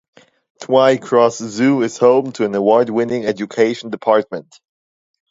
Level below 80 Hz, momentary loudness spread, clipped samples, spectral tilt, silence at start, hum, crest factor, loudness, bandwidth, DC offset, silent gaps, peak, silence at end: -64 dBFS; 8 LU; under 0.1%; -5.5 dB/octave; 0.6 s; none; 16 dB; -16 LUFS; 7.8 kHz; under 0.1%; none; 0 dBFS; 0.9 s